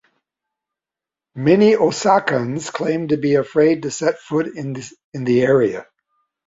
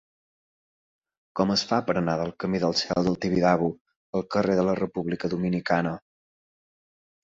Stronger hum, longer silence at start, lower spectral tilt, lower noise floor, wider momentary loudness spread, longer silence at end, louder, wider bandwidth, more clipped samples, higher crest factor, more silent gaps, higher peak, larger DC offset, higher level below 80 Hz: neither; about the same, 1.35 s vs 1.35 s; about the same, -6 dB/octave vs -6 dB/octave; about the same, -88 dBFS vs under -90 dBFS; first, 14 LU vs 9 LU; second, 0.65 s vs 1.3 s; first, -18 LUFS vs -26 LUFS; about the same, 8 kHz vs 7.8 kHz; neither; about the same, 18 dB vs 20 dB; second, 5.04-5.12 s vs 3.81-3.85 s, 3.96-4.13 s; first, -2 dBFS vs -6 dBFS; neither; about the same, -60 dBFS vs -56 dBFS